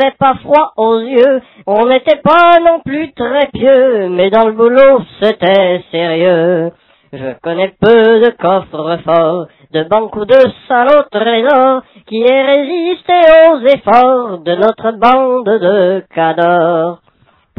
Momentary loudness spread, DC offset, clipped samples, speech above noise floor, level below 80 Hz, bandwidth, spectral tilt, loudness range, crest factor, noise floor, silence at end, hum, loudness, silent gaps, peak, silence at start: 10 LU; under 0.1%; 0.5%; 42 dB; -48 dBFS; 5.4 kHz; -8.5 dB/octave; 3 LU; 10 dB; -51 dBFS; 0.65 s; none; -10 LUFS; none; 0 dBFS; 0 s